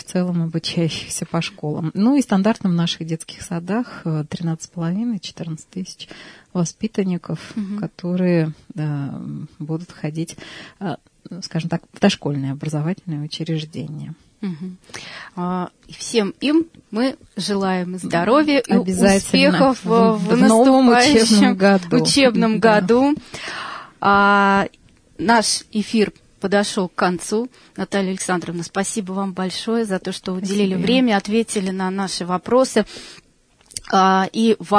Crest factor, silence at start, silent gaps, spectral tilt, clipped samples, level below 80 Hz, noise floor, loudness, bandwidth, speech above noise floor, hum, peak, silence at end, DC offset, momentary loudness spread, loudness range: 16 dB; 0.1 s; none; -5 dB/octave; under 0.1%; -52 dBFS; -51 dBFS; -19 LUFS; 11 kHz; 33 dB; none; -2 dBFS; 0 s; under 0.1%; 16 LU; 12 LU